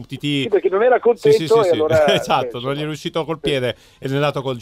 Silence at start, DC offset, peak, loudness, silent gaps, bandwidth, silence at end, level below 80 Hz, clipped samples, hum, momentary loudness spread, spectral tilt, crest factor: 0 s; under 0.1%; -2 dBFS; -18 LUFS; none; 15.5 kHz; 0 s; -52 dBFS; under 0.1%; none; 9 LU; -5.5 dB/octave; 14 dB